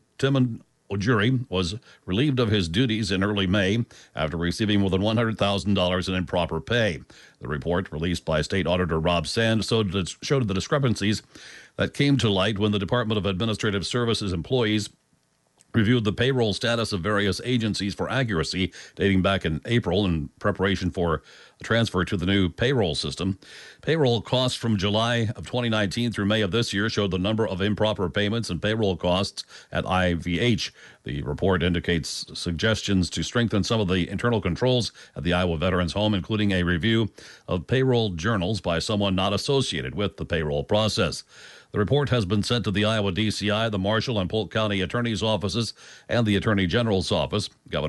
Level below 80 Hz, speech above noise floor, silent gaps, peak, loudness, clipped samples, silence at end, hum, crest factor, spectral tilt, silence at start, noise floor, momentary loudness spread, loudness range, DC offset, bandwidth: -46 dBFS; 43 dB; none; -8 dBFS; -24 LUFS; under 0.1%; 0 s; none; 16 dB; -5.5 dB/octave; 0.2 s; -67 dBFS; 7 LU; 1 LU; under 0.1%; 11.5 kHz